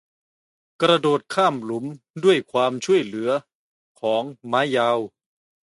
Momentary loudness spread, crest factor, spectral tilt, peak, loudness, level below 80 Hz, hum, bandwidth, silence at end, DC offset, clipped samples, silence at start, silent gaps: 10 LU; 18 dB; -5 dB/octave; -4 dBFS; -22 LUFS; -72 dBFS; none; 11.5 kHz; 0.6 s; under 0.1%; under 0.1%; 0.8 s; 2.10-2.14 s, 3.55-3.95 s